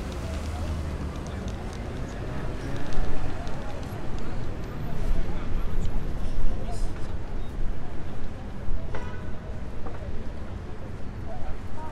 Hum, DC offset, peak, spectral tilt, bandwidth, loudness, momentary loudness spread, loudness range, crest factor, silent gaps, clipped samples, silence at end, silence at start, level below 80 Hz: none; under 0.1%; -8 dBFS; -6.5 dB/octave; 7.6 kHz; -35 LUFS; 6 LU; 4 LU; 16 dB; none; under 0.1%; 0 s; 0 s; -30 dBFS